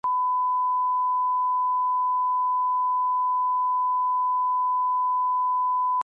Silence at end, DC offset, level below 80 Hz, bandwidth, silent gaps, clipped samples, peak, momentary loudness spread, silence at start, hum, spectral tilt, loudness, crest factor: 0 s; under 0.1%; -84 dBFS; 1.5 kHz; none; under 0.1%; -20 dBFS; 0 LU; 0.05 s; 50 Hz at -105 dBFS; -3.5 dB/octave; -23 LUFS; 4 dB